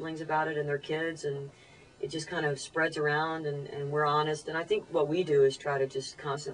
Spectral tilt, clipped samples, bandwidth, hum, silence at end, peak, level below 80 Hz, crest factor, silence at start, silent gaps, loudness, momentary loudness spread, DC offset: -5 dB/octave; under 0.1%; 10.5 kHz; none; 0 s; -16 dBFS; -68 dBFS; 16 dB; 0 s; none; -31 LUFS; 10 LU; under 0.1%